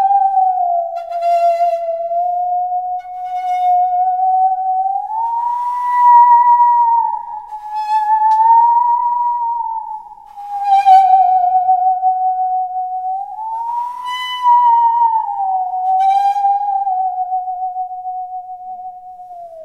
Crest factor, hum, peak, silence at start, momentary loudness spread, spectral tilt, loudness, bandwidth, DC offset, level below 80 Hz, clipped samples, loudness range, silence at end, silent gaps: 14 dB; none; 0 dBFS; 0 s; 16 LU; -1 dB/octave; -14 LUFS; 8 kHz; 0.1%; -60 dBFS; under 0.1%; 5 LU; 0 s; none